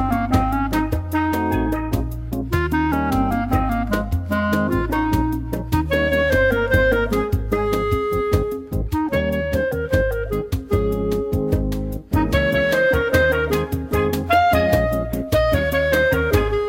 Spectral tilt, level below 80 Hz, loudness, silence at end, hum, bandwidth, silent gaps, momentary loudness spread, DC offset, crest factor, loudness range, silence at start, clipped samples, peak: -6.5 dB/octave; -30 dBFS; -20 LUFS; 0 s; none; 16.5 kHz; none; 6 LU; under 0.1%; 16 dB; 3 LU; 0 s; under 0.1%; -2 dBFS